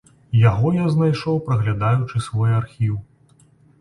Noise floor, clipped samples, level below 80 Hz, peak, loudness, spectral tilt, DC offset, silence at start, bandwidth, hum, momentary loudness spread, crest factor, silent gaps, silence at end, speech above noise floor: -54 dBFS; under 0.1%; -46 dBFS; -4 dBFS; -20 LUFS; -8 dB/octave; under 0.1%; 0.3 s; 11 kHz; none; 8 LU; 16 dB; none; 0.8 s; 36 dB